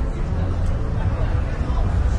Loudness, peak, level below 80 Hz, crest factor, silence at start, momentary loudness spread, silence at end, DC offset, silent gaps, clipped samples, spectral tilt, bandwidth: -24 LUFS; -10 dBFS; -22 dBFS; 10 dB; 0 s; 2 LU; 0 s; under 0.1%; none; under 0.1%; -8 dB/octave; 8.8 kHz